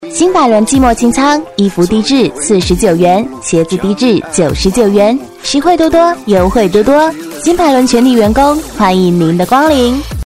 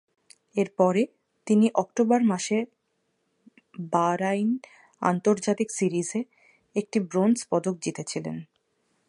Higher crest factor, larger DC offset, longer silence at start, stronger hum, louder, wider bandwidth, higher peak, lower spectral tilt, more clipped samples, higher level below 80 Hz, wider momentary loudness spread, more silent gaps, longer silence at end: second, 10 dB vs 20 dB; first, 0.4% vs under 0.1%; second, 0 s vs 0.55 s; neither; first, -9 LUFS vs -26 LUFS; first, 16.5 kHz vs 11.5 kHz; first, 0 dBFS vs -6 dBFS; about the same, -5 dB/octave vs -5.5 dB/octave; neither; first, -28 dBFS vs -74 dBFS; second, 5 LU vs 11 LU; neither; second, 0 s vs 0.65 s